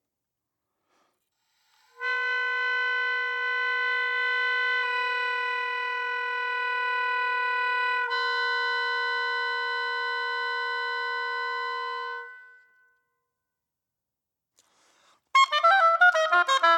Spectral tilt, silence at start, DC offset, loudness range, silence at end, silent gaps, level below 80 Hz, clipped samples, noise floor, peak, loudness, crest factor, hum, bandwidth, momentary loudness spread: 2.5 dB/octave; 2 s; under 0.1%; 8 LU; 0 s; none; under -90 dBFS; under 0.1%; -87 dBFS; -8 dBFS; -25 LUFS; 18 dB; none; 12 kHz; 10 LU